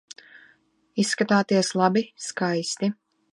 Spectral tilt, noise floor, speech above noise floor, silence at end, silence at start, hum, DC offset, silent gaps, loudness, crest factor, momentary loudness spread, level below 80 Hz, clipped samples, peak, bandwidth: -4.5 dB/octave; -62 dBFS; 39 dB; 0.4 s; 0.95 s; none; under 0.1%; none; -24 LUFS; 20 dB; 18 LU; -76 dBFS; under 0.1%; -4 dBFS; 11.5 kHz